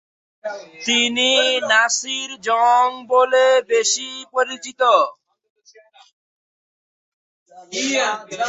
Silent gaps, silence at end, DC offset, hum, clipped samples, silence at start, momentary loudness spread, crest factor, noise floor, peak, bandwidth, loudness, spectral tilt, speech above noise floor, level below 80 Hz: 5.50-5.56 s, 6.13-7.46 s; 0 s; under 0.1%; none; under 0.1%; 0.45 s; 11 LU; 18 dB; -50 dBFS; -2 dBFS; 8.4 kHz; -17 LUFS; 0 dB/octave; 32 dB; -72 dBFS